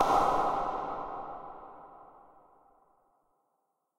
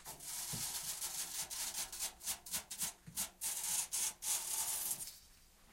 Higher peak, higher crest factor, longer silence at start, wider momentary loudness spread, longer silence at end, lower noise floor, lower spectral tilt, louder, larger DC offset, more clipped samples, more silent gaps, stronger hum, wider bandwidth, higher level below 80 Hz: first, -12 dBFS vs -22 dBFS; about the same, 22 dB vs 20 dB; about the same, 0 s vs 0 s; first, 25 LU vs 7 LU; first, 1.9 s vs 0 s; first, -80 dBFS vs -64 dBFS; first, -4.5 dB/octave vs 0.5 dB/octave; first, -31 LUFS vs -39 LUFS; neither; neither; neither; neither; about the same, 16 kHz vs 16.5 kHz; first, -54 dBFS vs -68 dBFS